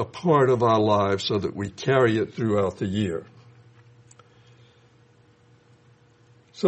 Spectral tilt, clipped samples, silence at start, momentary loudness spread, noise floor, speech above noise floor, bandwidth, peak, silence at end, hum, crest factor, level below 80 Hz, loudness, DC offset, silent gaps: -6.5 dB/octave; under 0.1%; 0 s; 10 LU; -57 dBFS; 35 dB; 8.4 kHz; -6 dBFS; 0 s; none; 20 dB; -62 dBFS; -23 LUFS; under 0.1%; none